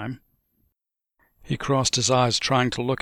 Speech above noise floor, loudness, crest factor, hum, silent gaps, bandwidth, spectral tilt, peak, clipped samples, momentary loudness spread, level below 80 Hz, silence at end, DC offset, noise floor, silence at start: 60 dB; -22 LUFS; 18 dB; none; none; 13 kHz; -4 dB/octave; -8 dBFS; under 0.1%; 14 LU; -52 dBFS; 0.05 s; under 0.1%; -82 dBFS; 0 s